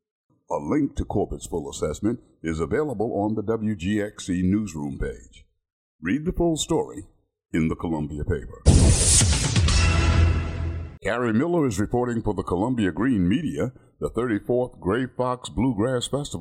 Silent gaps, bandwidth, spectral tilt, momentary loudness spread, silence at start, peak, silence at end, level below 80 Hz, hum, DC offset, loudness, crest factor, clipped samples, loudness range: 5.73-5.99 s; 14.5 kHz; -5 dB/octave; 11 LU; 0.5 s; -4 dBFS; 0 s; -32 dBFS; none; under 0.1%; -24 LUFS; 20 dB; under 0.1%; 7 LU